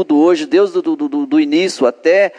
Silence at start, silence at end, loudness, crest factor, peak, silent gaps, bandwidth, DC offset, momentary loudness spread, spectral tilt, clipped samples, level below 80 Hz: 0 s; 0.05 s; -14 LUFS; 12 dB; -2 dBFS; none; 10.5 kHz; under 0.1%; 6 LU; -4.5 dB/octave; under 0.1%; -72 dBFS